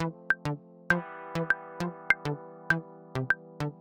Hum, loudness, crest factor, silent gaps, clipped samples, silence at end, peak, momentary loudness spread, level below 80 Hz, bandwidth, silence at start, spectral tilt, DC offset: none; -31 LUFS; 26 dB; none; under 0.1%; 0 s; -6 dBFS; 10 LU; -58 dBFS; 16.5 kHz; 0 s; -6 dB/octave; under 0.1%